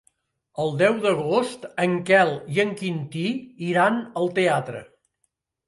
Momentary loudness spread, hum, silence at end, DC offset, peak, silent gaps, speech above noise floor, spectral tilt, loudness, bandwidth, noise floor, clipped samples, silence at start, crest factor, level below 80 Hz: 11 LU; none; 0.85 s; under 0.1%; -4 dBFS; none; 52 dB; -6 dB/octave; -23 LUFS; 11.5 kHz; -75 dBFS; under 0.1%; 0.55 s; 20 dB; -68 dBFS